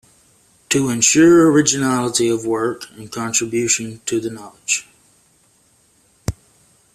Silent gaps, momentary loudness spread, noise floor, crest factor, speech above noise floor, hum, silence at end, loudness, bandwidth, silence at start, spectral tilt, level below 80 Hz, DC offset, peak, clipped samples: none; 19 LU; -57 dBFS; 18 dB; 40 dB; none; 0.6 s; -16 LUFS; 14.5 kHz; 0.7 s; -3.5 dB/octave; -48 dBFS; under 0.1%; 0 dBFS; under 0.1%